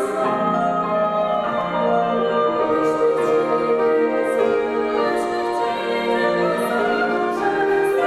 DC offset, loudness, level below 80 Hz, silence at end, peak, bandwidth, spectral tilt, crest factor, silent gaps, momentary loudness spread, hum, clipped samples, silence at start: under 0.1%; -20 LUFS; -56 dBFS; 0 s; -6 dBFS; 13.5 kHz; -5.5 dB/octave; 12 dB; none; 3 LU; none; under 0.1%; 0 s